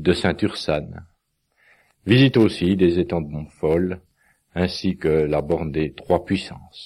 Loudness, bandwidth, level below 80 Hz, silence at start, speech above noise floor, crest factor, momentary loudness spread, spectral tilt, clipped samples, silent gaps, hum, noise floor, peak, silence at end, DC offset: -21 LUFS; 12 kHz; -44 dBFS; 0 s; 48 dB; 18 dB; 16 LU; -7 dB/octave; under 0.1%; none; none; -68 dBFS; -4 dBFS; 0 s; under 0.1%